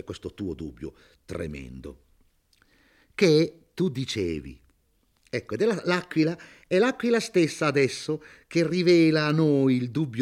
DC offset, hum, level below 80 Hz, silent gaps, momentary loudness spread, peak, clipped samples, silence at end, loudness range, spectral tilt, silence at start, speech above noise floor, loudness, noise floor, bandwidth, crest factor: under 0.1%; none; -56 dBFS; none; 19 LU; -6 dBFS; under 0.1%; 0 s; 6 LU; -6 dB/octave; 0.05 s; 43 dB; -25 LUFS; -68 dBFS; 13 kHz; 20 dB